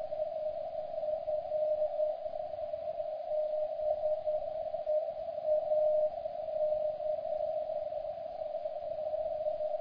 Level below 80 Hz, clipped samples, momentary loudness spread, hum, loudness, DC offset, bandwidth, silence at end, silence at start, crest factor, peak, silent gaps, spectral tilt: -66 dBFS; under 0.1%; 7 LU; none; -35 LUFS; under 0.1%; 5.2 kHz; 0 s; 0 s; 14 dB; -20 dBFS; none; -4 dB/octave